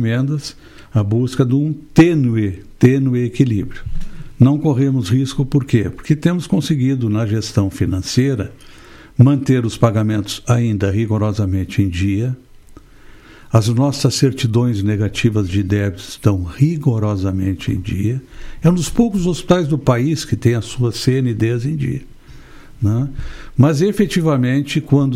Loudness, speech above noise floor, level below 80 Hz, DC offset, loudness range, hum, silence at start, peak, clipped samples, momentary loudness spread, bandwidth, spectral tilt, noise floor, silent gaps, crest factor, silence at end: -17 LUFS; 25 dB; -36 dBFS; under 0.1%; 3 LU; none; 0 s; 0 dBFS; under 0.1%; 8 LU; 14.5 kHz; -7 dB/octave; -41 dBFS; none; 16 dB; 0 s